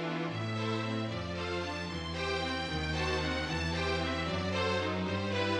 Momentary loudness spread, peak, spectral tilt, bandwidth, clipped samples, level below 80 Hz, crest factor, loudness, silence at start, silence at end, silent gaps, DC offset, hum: 4 LU; -18 dBFS; -5.5 dB/octave; 11 kHz; under 0.1%; -48 dBFS; 16 dB; -34 LUFS; 0 s; 0 s; none; under 0.1%; none